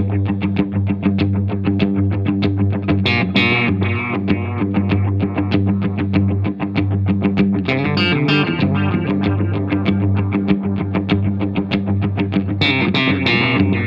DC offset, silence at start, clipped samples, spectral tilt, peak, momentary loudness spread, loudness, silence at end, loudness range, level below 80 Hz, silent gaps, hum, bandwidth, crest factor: under 0.1%; 0 s; under 0.1%; -8.5 dB/octave; -2 dBFS; 5 LU; -17 LUFS; 0 s; 1 LU; -46 dBFS; none; none; 5.8 kHz; 14 dB